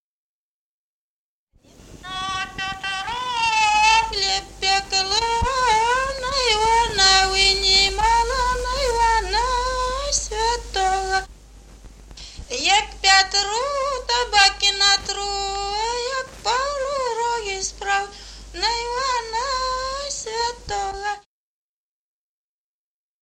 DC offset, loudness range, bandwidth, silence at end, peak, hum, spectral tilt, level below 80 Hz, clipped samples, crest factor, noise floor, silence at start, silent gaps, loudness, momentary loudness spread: under 0.1%; 9 LU; 16 kHz; 2 s; -2 dBFS; none; -0.5 dB/octave; -38 dBFS; under 0.1%; 20 dB; under -90 dBFS; 1.85 s; none; -20 LUFS; 12 LU